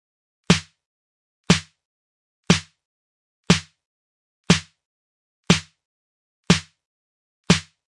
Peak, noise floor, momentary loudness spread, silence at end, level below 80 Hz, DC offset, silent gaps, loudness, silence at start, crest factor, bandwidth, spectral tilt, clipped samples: 0 dBFS; under -90 dBFS; 0 LU; 0.4 s; -50 dBFS; under 0.1%; 0.86-1.44 s, 1.85-2.43 s, 2.85-3.44 s, 3.86-4.44 s, 4.86-5.43 s, 5.85-6.43 s, 6.85-7.44 s; -21 LUFS; 0.5 s; 24 dB; 11.5 kHz; -4 dB/octave; under 0.1%